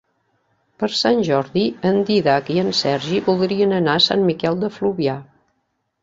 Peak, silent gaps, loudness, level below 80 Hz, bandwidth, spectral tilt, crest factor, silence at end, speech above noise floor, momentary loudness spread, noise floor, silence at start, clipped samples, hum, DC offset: -2 dBFS; none; -18 LUFS; -58 dBFS; 7.8 kHz; -5.5 dB/octave; 16 dB; 0.8 s; 53 dB; 7 LU; -71 dBFS; 0.8 s; under 0.1%; none; under 0.1%